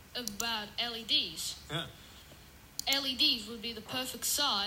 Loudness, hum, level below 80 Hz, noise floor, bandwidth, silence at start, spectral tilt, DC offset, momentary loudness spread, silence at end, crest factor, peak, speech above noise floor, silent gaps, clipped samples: -32 LUFS; none; -62 dBFS; -55 dBFS; 16 kHz; 0 s; -1 dB/octave; under 0.1%; 15 LU; 0 s; 20 dB; -14 dBFS; 21 dB; none; under 0.1%